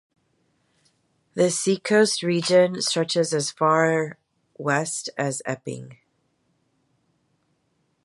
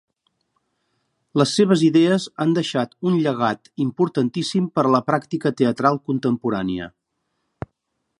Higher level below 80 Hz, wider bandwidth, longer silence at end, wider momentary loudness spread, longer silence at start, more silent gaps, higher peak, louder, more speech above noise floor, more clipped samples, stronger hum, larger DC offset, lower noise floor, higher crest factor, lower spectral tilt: second, -72 dBFS vs -58 dBFS; about the same, 11.5 kHz vs 11.5 kHz; first, 2.1 s vs 1.3 s; about the same, 13 LU vs 11 LU; about the same, 1.35 s vs 1.35 s; neither; second, -6 dBFS vs -2 dBFS; about the same, -22 LUFS vs -20 LUFS; second, 48 dB vs 56 dB; neither; neither; neither; second, -70 dBFS vs -75 dBFS; about the same, 20 dB vs 20 dB; second, -4 dB/octave vs -6 dB/octave